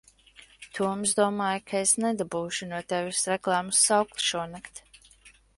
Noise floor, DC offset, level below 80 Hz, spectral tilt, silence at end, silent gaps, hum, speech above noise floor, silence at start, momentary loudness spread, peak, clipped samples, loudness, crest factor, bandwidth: -57 dBFS; under 0.1%; -66 dBFS; -2.5 dB/octave; 0.3 s; none; none; 30 dB; 0.6 s; 15 LU; -6 dBFS; under 0.1%; -26 LUFS; 22 dB; 11.5 kHz